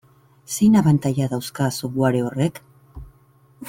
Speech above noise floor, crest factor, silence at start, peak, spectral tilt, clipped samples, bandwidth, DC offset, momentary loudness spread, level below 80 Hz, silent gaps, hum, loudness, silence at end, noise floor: 36 dB; 16 dB; 0.5 s; -4 dBFS; -6.5 dB/octave; under 0.1%; 16.5 kHz; under 0.1%; 9 LU; -50 dBFS; none; none; -20 LUFS; 0 s; -55 dBFS